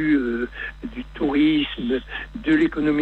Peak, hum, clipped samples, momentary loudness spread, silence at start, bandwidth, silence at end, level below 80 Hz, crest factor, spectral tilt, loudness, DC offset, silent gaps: -8 dBFS; none; under 0.1%; 13 LU; 0 s; 4.4 kHz; 0 s; -42 dBFS; 14 dB; -7 dB/octave; -22 LUFS; under 0.1%; none